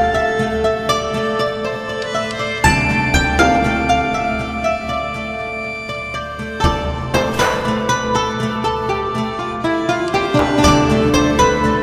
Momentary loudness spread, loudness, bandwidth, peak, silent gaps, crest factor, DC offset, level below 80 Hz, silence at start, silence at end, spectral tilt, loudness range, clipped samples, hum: 10 LU; -17 LUFS; 16 kHz; 0 dBFS; none; 16 dB; under 0.1%; -30 dBFS; 0 s; 0 s; -5 dB/octave; 4 LU; under 0.1%; none